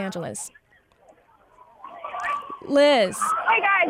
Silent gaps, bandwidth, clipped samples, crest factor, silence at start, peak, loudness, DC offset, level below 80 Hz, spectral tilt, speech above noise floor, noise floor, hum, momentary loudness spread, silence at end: none; 16 kHz; under 0.1%; 16 dB; 0 s; -8 dBFS; -22 LUFS; under 0.1%; -68 dBFS; -3 dB/octave; 36 dB; -57 dBFS; none; 19 LU; 0 s